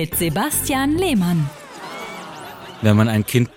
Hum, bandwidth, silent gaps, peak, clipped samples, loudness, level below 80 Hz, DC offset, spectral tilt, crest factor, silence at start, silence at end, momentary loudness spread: none; 17 kHz; none; -4 dBFS; under 0.1%; -18 LUFS; -44 dBFS; under 0.1%; -5 dB/octave; 16 dB; 0 s; 0.1 s; 18 LU